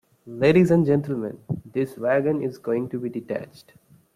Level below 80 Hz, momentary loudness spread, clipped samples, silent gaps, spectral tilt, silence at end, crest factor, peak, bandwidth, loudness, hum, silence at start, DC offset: -60 dBFS; 14 LU; under 0.1%; none; -8.5 dB/octave; 0.7 s; 18 dB; -6 dBFS; 14 kHz; -23 LUFS; none; 0.25 s; under 0.1%